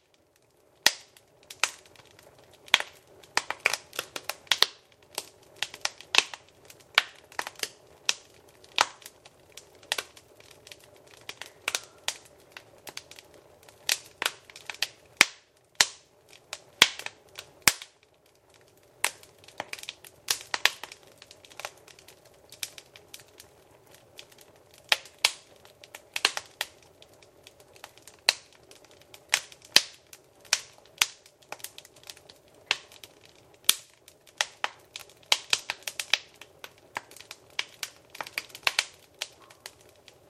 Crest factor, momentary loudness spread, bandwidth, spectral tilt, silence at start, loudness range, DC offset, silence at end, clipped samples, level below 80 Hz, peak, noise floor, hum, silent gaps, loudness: 34 dB; 24 LU; 16 kHz; 1.5 dB/octave; 0.85 s; 8 LU; under 0.1%; 0.6 s; under 0.1%; -72 dBFS; 0 dBFS; -65 dBFS; none; none; -28 LUFS